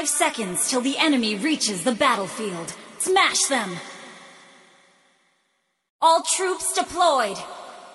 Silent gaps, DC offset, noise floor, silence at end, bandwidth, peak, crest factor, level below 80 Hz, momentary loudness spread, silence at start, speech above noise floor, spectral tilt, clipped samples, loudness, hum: 5.90-5.99 s; under 0.1%; -71 dBFS; 0 s; 12.5 kHz; -6 dBFS; 18 dB; -64 dBFS; 17 LU; 0 s; 49 dB; -2 dB/octave; under 0.1%; -21 LUFS; none